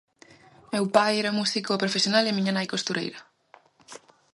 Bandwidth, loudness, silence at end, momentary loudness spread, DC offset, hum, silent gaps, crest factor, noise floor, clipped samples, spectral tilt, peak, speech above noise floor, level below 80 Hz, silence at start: 11.5 kHz; -25 LUFS; 0.35 s; 10 LU; under 0.1%; none; none; 24 dB; -57 dBFS; under 0.1%; -4 dB/octave; -4 dBFS; 32 dB; -74 dBFS; 0.7 s